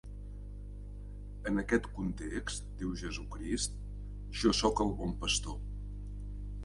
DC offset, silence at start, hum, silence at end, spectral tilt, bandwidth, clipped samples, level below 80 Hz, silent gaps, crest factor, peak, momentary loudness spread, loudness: under 0.1%; 0.05 s; 50 Hz at -40 dBFS; 0 s; -4 dB/octave; 11.5 kHz; under 0.1%; -42 dBFS; none; 22 dB; -14 dBFS; 17 LU; -35 LUFS